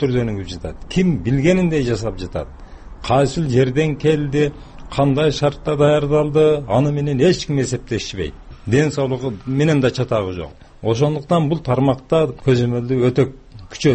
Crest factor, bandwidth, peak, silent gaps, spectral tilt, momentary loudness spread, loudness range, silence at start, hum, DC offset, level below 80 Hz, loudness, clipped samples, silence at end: 14 dB; 8.8 kHz; -4 dBFS; none; -7 dB/octave; 12 LU; 3 LU; 0 s; none; under 0.1%; -38 dBFS; -18 LUFS; under 0.1%; 0 s